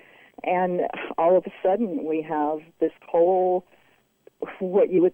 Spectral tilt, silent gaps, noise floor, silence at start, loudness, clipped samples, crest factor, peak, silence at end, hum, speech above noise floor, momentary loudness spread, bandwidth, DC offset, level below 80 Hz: -9.5 dB/octave; none; -58 dBFS; 0.45 s; -24 LUFS; under 0.1%; 14 dB; -10 dBFS; 0 s; none; 35 dB; 8 LU; 3.6 kHz; under 0.1%; -68 dBFS